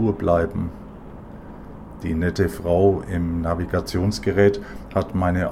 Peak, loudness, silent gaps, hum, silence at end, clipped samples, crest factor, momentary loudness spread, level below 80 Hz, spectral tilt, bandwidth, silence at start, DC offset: -4 dBFS; -22 LUFS; none; none; 0 s; under 0.1%; 18 dB; 21 LU; -38 dBFS; -7.5 dB/octave; 15.5 kHz; 0 s; under 0.1%